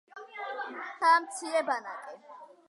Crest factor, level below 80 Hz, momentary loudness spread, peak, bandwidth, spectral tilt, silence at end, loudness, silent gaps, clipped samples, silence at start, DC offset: 20 dB; under -90 dBFS; 21 LU; -12 dBFS; 11.5 kHz; -0.5 dB/octave; 0.25 s; -29 LUFS; none; under 0.1%; 0.15 s; under 0.1%